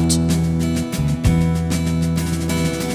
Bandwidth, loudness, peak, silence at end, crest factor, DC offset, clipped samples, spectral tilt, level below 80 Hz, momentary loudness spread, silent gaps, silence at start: 16 kHz; -19 LUFS; -2 dBFS; 0 s; 16 dB; under 0.1%; under 0.1%; -5.5 dB/octave; -28 dBFS; 4 LU; none; 0 s